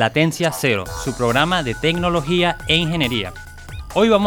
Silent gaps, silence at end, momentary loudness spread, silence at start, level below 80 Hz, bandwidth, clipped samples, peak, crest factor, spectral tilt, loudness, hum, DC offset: none; 0 s; 11 LU; 0 s; -38 dBFS; 19.5 kHz; under 0.1%; -2 dBFS; 18 dB; -5 dB/octave; -19 LUFS; none; under 0.1%